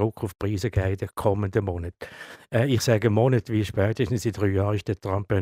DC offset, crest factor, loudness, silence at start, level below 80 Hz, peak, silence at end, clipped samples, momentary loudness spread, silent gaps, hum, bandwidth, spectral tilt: under 0.1%; 18 dB; -25 LUFS; 0 s; -48 dBFS; -6 dBFS; 0 s; under 0.1%; 10 LU; none; none; 15.5 kHz; -6.5 dB/octave